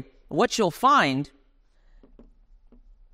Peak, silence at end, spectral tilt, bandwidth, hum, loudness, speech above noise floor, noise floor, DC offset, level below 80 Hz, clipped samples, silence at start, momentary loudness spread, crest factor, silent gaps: -8 dBFS; 1.9 s; -4 dB/octave; 16 kHz; none; -22 LUFS; 38 dB; -60 dBFS; under 0.1%; -56 dBFS; under 0.1%; 0 s; 12 LU; 20 dB; none